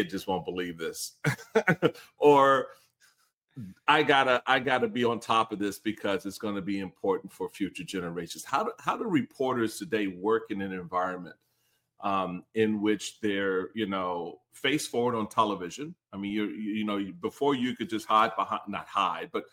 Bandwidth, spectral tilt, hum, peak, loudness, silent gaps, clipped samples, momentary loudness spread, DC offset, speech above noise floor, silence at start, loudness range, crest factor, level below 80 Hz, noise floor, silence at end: 16.5 kHz; -4.5 dB/octave; none; -6 dBFS; -29 LUFS; 3.34-3.48 s; under 0.1%; 11 LU; under 0.1%; 45 dB; 0 s; 6 LU; 22 dB; -70 dBFS; -74 dBFS; 0.1 s